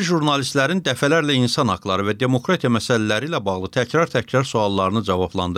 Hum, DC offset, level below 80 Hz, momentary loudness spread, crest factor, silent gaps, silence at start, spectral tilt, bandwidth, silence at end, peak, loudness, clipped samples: none; under 0.1%; -58 dBFS; 4 LU; 14 dB; none; 0 s; -5 dB/octave; 15 kHz; 0 s; -6 dBFS; -20 LUFS; under 0.1%